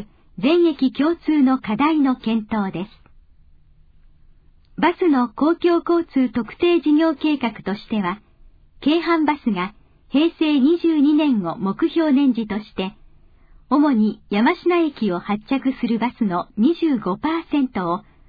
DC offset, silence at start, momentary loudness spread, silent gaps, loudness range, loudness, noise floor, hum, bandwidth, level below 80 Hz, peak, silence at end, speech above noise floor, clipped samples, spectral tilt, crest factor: under 0.1%; 0 s; 9 LU; none; 4 LU; -20 LUFS; -50 dBFS; none; 5 kHz; -52 dBFS; -6 dBFS; 0.3 s; 31 dB; under 0.1%; -8.5 dB/octave; 14 dB